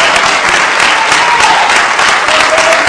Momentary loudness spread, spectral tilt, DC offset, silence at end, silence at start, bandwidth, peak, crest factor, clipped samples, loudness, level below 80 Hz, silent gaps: 1 LU; -0.5 dB/octave; under 0.1%; 0 s; 0 s; 11 kHz; 0 dBFS; 8 dB; 0.8%; -6 LUFS; -42 dBFS; none